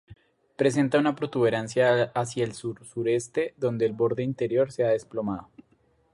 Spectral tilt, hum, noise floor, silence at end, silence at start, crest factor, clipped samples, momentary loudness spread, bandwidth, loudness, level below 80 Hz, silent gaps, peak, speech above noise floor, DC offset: -6 dB/octave; none; -65 dBFS; 0.7 s; 0.1 s; 16 dB; under 0.1%; 9 LU; 11.5 kHz; -26 LUFS; -64 dBFS; none; -10 dBFS; 40 dB; under 0.1%